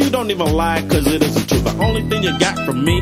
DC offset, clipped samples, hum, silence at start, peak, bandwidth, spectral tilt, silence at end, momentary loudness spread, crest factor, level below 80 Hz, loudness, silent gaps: under 0.1%; under 0.1%; none; 0 s; 0 dBFS; 16 kHz; -5 dB/octave; 0 s; 2 LU; 16 dB; -28 dBFS; -17 LUFS; none